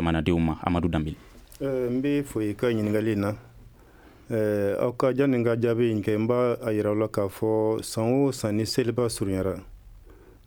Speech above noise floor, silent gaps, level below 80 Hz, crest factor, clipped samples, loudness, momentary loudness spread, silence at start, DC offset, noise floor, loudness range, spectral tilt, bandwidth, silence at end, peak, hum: 27 dB; none; -46 dBFS; 18 dB; under 0.1%; -26 LUFS; 6 LU; 0 s; under 0.1%; -52 dBFS; 3 LU; -6.5 dB/octave; over 20 kHz; 0.35 s; -6 dBFS; none